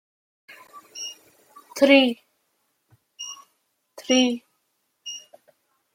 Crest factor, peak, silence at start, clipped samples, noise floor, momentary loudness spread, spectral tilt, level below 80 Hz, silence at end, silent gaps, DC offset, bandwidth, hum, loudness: 24 dB; -2 dBFS; 0.75 s; under 0.1%; -73 dBFS; 25 LU; -2 dB/octave; -74 dBFS; 0.75 s; none; under 0.1%; 16.5 kHz; none; -21 LUFS